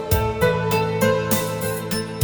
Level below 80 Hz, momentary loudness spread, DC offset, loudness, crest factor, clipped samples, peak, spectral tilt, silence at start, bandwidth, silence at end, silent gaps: -36 dBFS; 6 LU; under 0.1%; -21 LUFS; 16 dB; under 0.1%; -4 dBFS; -5 dB/octave; 0 s; over 20 kHz; 0 s; none